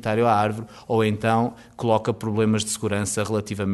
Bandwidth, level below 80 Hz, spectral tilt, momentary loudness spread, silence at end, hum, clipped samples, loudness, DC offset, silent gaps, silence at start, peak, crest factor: 12 kHz; -56 dBFS; -5.5 dB/octave; 6 LU; 0 s; none; under 0.1%; -23 LUFS; under 0.1%; none; 0 s; -6 dBFS; 16 dB